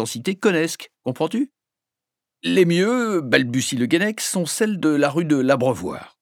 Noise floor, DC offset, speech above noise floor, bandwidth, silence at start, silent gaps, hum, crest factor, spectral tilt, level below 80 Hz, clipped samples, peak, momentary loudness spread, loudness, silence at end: -86 dBFS; under 0.1%; 66 dB; 18 kHz; 0 s; none; none; 20 dB; -4.5 dB/octave; -64 dBFS; under 0.1%; 0 dBFS; 10 LU; -20 LUFS; 0.15 s